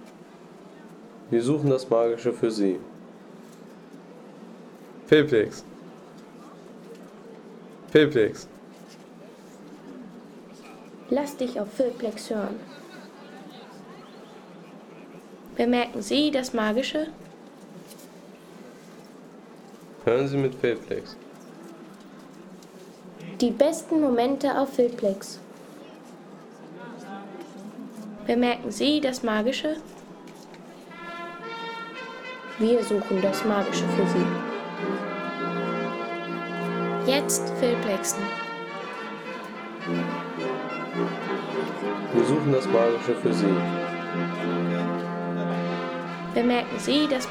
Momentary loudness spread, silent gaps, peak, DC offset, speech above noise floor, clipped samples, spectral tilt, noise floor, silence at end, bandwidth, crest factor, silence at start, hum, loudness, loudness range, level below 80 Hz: 23 LU; none; -6 dBFS; under 0.1%; 23 dB; under 0.1%; -5 dB/octave; -47 dBFS; 0 s; 18 kHz; 22 dB; 0 s; none; -26 LUFS; 7 LU; -64 dBFS